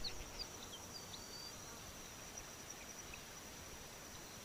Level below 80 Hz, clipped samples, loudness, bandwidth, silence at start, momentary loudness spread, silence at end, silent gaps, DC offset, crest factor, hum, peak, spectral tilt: -62 dBFS; under 0.1%; -50 LUFS; over 20 kHz; 0 s; 4 LU; 0 s; none; under 0.1%; 18 dB; none; -34 dBFS; -2 dB/octave